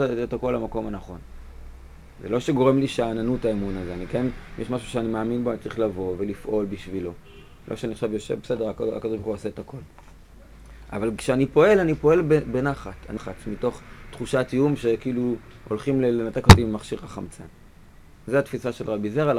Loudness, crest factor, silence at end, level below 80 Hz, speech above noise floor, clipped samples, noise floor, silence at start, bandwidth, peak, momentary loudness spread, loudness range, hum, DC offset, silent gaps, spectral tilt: -24 LUFS; 24 dB; 0 s; -36 dBFS; 25 dB; under 0.1%; -48 dBFS; 0 s; 16 kHz; 0 dBFS; 17 LU; 9 LU; none; 0.1%; none; -6.5 dB/octave